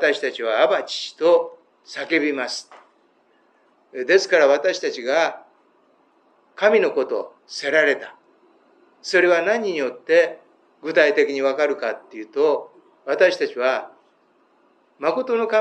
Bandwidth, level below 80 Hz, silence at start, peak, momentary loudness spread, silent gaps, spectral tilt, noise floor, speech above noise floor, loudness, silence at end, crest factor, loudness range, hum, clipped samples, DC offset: 9.2 kHz; under -90 dBFS; 0 s; -2 dBFS; 14 LU; none; -3 dB/octave; -60 dBFS; 41 dB; -20 LUFS; 0 s; 18 dB; 3 LU; none; under 0.1%; under 0.1%